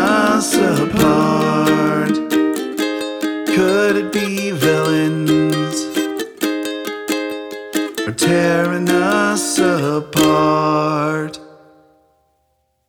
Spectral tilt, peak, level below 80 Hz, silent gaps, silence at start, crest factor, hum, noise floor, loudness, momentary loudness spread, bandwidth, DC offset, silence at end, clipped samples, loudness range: -4.5 dB/octave; -2 dBFS; -50 dBFS; none; 0 s; 14 dB; none; -65 dBFS; -16 LUFS; 8 LU; over 20 kHz; under 0.1%; 1.4 s; under 0.1%; 4 LU